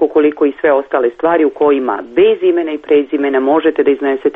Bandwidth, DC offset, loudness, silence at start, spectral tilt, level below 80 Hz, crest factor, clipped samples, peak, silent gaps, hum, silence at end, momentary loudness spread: 3.9 kHz; under 0.1%; -13 LUFS; 0 s; -7.5 dB/octave; -54 dBFS; 12 dB; under 0.1%; -2 dBFS; none; none; 0.05 s; 3 LU